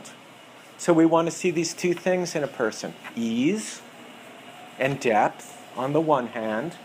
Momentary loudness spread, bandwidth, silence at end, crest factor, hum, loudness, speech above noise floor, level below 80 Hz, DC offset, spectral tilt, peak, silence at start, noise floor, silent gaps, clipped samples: 23 LU; 15.5 kHz; 0 s; 20 dB; none; -25 LUFS; 23 dB; -70 dBFS; under 0.1%; -5 dB/octave; -6 dBFS; 0 s; -47 dBFS; none; under 0.1%